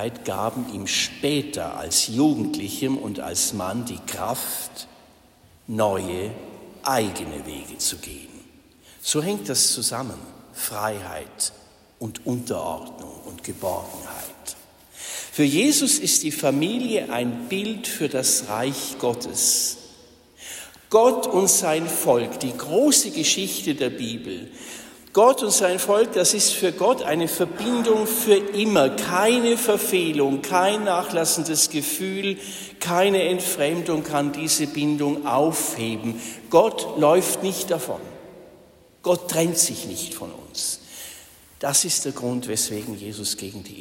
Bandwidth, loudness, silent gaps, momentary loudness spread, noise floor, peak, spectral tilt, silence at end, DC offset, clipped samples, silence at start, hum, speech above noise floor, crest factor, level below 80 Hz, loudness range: 16.5 kHz; -22 LUFS; none; 17 LU; -54 dBFS; -4 dBFS; -3 dB/octave; 0 s; under 0.1%; under 0.1%; 0 s; none; 31 dB; 20 dB; -58 dBFS; 8 LU